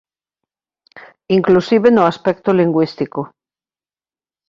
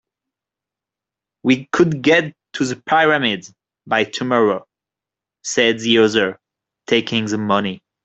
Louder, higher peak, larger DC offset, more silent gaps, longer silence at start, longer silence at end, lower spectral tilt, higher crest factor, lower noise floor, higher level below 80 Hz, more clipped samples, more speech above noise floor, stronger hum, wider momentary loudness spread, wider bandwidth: about the same, -15 LUFS vs -17 LUFS; about the same, 0 dBFS vs -2 dBFS; neither; neither; second, 1.3 s vs 1.45 s; first, 1.2 s vs 0.25 s; first, -8 dB/octave vs -4.5 dB/octave; about the same, 16 dB vs 18 dB; about the same, under -90 dBFS vs -87 dBFS; about the same, -58 dBFS vs -60 dBFS; neither; first, over 76 dB vs 70 dB; neither; about the same, 11 LU vs 10 LU; second, 7.4 kHz vs 8.2 kHz